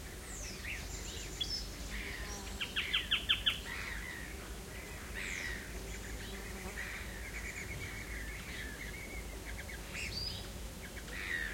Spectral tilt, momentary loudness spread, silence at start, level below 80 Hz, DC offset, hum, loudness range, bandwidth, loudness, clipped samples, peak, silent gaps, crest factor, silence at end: -2.5 dB/octave; 12 LU; 0 s; -48 dBFS; under 0.1%; none; 7 LU; 16.5 kHz; -40 LUFS; under 0.1%; -18 dBFS; none; 24 dB; 0 s